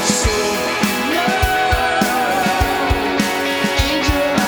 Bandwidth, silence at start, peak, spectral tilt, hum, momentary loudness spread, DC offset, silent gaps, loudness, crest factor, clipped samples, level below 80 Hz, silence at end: over 20 kHz; 0 s; 0 dBFS; -3.5 dB/octave; none; 2 LU; under 0.1%; none; -16 LUFS; 16 dB; under 0.1%; -28 dBFS; 0 s